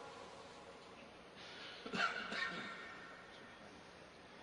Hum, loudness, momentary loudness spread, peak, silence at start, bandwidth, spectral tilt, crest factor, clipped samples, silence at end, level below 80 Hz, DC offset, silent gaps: none; -46 LUFS; 18 LU; -24 dBFS; 0 s; 10.5 kHz; -3 dB/octave; 24 dB; under 0.1%; 0 s; -78 dBFS; under 0.1%; none